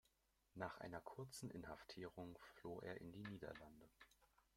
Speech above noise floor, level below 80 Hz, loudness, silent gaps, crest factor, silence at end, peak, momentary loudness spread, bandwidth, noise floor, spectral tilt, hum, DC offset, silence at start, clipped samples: 28 dB; -76 dBFS; -56 LUFS; none; 24 dB; 0.15 s; -32 dBFS; 10 LU; 16.5 kHz; -83 dBFS; -5.5 dB/octave; none; under 0.1%; 0.55 s; under 0.1%